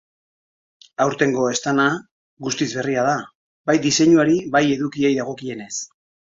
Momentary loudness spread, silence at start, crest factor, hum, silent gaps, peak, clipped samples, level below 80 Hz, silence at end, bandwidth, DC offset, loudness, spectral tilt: 14 LU; 1 s; 18 dB; none; 2.11-2.37 s, 3.35-3.64 s; -2 dBFS; under 0.1%; -60 dBFS; 0.45 s; 7.8 kHz; under 0.1%; -20 LUFS; -4.5 dB/octave